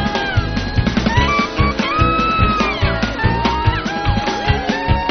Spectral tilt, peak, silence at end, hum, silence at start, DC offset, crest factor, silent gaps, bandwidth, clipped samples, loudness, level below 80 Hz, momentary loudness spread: -4 dB/octave; -2 dBFS; 0 s; none; 0 s; under 0.1%; 16 dB; none; 6.6 kHz; under 0.1%; -17 LUFS; -24 dBFS; 4 LU